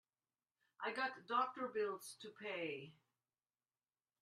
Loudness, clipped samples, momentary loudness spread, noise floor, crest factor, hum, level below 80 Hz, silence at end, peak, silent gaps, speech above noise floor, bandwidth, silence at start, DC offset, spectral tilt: -44 LUFS; under 0.1%; 12 LU; under -90 dBFS; 22 dB; none; under -90 dBFS; 1.3 s; -24 dBFS; none; over 46 dB; 12.5 kHz; 0.8 s; under 0.1%; -3.5 dB/octave